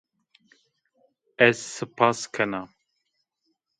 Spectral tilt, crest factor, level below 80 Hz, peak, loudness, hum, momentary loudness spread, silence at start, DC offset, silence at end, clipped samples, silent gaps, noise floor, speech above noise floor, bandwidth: -4 dB/octave; 26 dB; -72 dBFS; -2 dBFS; -24 LUFS; none; 15 LU; 1.4 s; under 0.1%; 1.15 s; under 0.1%; none; -77 dBFS; 53 dB; 11 kHz